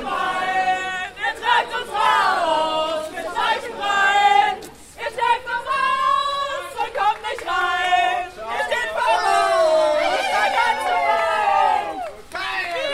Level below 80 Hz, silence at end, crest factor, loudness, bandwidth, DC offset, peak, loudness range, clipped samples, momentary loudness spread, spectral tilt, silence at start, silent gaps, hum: -54 dBFS; 0 s; 18 dB; -20 LUFS; 16 kHz; under 0.1%; -4 dBFS; 3 LU; under 0.1%; 10 LU; -1.5 dB/octave; 0 s; none; none